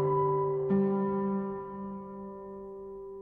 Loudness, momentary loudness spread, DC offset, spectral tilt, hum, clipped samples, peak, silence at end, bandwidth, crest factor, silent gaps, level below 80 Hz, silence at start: -31 LUFS; 16 LU; under 0.1%; -12.5 dB/octave; none; under 0.1%; -18 dBFS; 0 s; 3.3 kHz; 14 dB; none; -62 dBFS; 0 s